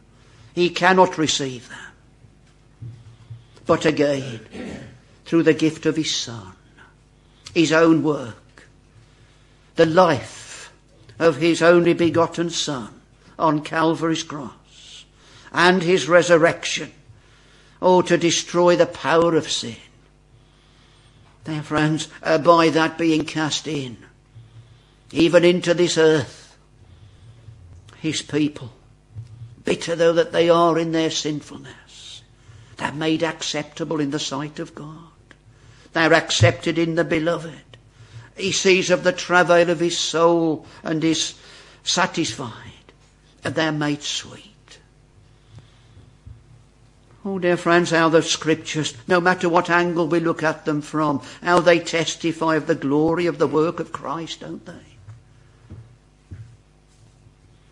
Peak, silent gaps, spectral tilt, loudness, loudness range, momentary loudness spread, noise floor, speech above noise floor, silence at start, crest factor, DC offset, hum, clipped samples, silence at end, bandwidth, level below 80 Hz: 0 dBFS; none; -4.5 dB/octave; -19 LUFS; 7 LU; 20 LU; -53 dBFS; 34 dB; 0.55 s; 22 dB; under 0.1%; none; under 0.1%; 1.25 s; 11 kHz; -56 dBFS